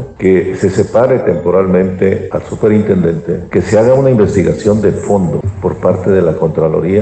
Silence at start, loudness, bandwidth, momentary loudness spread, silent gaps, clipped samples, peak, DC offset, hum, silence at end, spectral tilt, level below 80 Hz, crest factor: 0 s; -12 LUFS; 8.8 kHz; 6 LU; none; under 0.1%; 0 dBFS; under 0.1%; none; 0 s; -8 dB/octave; -38 dBFS; 10 dB